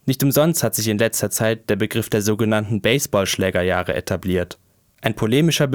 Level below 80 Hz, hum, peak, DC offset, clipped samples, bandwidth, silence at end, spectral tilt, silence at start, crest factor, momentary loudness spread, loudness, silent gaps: -48 dBFS; none; -2 dBFS; under 0.1%; under 0.1%; over 20 kHz; 0 s; -4.5 dB/octave; 0.05 s; 18 dB; 7 LU; -19 LUFS; none